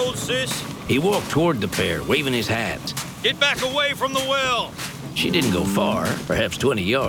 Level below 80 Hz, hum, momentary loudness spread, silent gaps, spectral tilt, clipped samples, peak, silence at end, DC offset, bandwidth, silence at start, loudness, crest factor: -46 dBFS; none; 6 LU; none; -4 dB/octave; under 0.1%; -4 dBFS; 0 s; under 0.1%; 19.5 kHz; 0 s; -21 LUFS; 18 dB